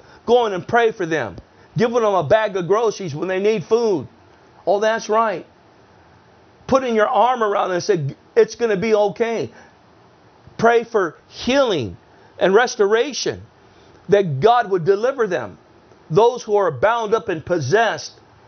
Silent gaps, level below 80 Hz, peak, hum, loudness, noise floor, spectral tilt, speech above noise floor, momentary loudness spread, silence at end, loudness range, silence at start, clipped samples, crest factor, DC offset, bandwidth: none; -56 dBFS; 0 dBFS; none; -18 LUFS; -50 dBFS; -5 dB/octave; 32 dB; 10 LU; 0.35 s; 3 LU; 0.25 s; under 0.1%; 18 dB; under 0.1%; 6.6 kHz